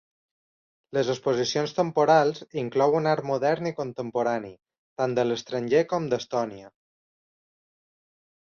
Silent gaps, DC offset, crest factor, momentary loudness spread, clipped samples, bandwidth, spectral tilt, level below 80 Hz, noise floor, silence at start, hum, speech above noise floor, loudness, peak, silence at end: 4.78-4.96 s; under 0.1%; 20 dB; 10 LU; under 0.1%; 7.2 kHz; -5.5 dB/octave; -68 dBFS; under -90 dBFS; 0.95 s; none; over 65 dB; -25 LUFS; -8 dBFS; 1.8 s